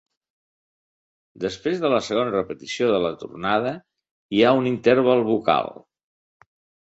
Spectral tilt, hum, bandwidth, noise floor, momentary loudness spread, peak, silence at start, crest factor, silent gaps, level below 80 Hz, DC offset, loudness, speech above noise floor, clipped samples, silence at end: -5.5 dB/octave; none; 8 kHz; under -90 dBFS; 12 LU; -4 dBFS; 1.4 s; 20 dB; 4.11-4.29 s; -60 dBFS; under 0.1%; -22 LUFS; over 69 dB; under 0.1%; 1.15 s